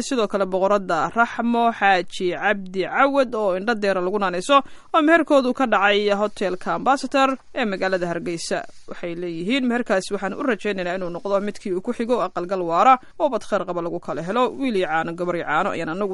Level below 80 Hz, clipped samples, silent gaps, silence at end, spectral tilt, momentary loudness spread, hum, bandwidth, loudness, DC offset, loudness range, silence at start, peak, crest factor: -54 dBFS; under 0.1%; none; 0 s; -5 dB/octave; 9 LU; none; 11.5 kHz; -21 LUFS; under 0.1%; 5 LU; 0 s; -2 dBFS; 18 dB